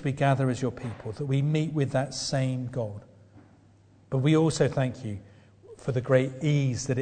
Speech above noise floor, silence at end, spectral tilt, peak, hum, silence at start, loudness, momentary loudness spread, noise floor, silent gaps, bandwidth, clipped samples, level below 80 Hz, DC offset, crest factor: 31 dB; 0 s; -6.5 dB/octave; -8 dBFS; none; 0 s; -27 LUFS; 13 LU; -57 dBFS; none; 9.4 kHz; under 0.1%; -58 dBFS; under 0.1%; 18 dB